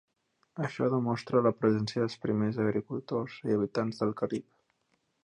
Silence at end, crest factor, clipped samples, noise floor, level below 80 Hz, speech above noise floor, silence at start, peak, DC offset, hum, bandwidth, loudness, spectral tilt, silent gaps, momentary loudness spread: 0.8 s; 18 dB; under 0.1%; -76 dBFS; -68 dBFS; 46 dB; 0.55 s; -14 dBFS; under 0.1%; none; 9.8 kHz; -31 LUFS; -7.5 dB/octave; none; 8 LU